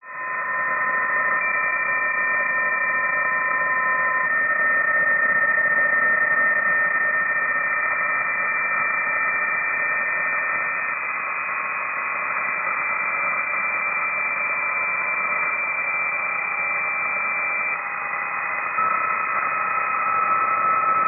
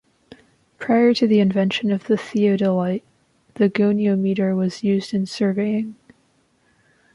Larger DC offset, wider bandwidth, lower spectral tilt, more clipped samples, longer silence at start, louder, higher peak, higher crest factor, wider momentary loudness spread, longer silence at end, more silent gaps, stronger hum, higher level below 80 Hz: neither; second, 2.9 kHz vs 11 kHz; second, 5.5 dB/octave vs -7 dB/octave; neither; second, 0.05 s vs 0.8 s; about the same, -20 LUFS vs -20 LUFS; second, -10 dBFS vs -6 dBFS; about the same, 12 dB vs 14 dB; about the same, 6 LU vs 8 LU; second, 0 s vs 1.2 s; neither; neither; about the same, -66 dBFS vs -64 dBFS